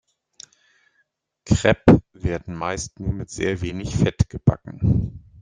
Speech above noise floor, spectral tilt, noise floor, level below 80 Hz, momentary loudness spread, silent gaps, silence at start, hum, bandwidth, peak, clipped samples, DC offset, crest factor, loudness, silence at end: 49 dB; -6.5 dB/octave; -69 dBFS; -38 dBFS; 12 LU; none; 1.45 s; none; 9.8 kHz; -2 dBFS; under 0.1%; under 0.1%; 20 dB; -22 LUFS; 0.25 s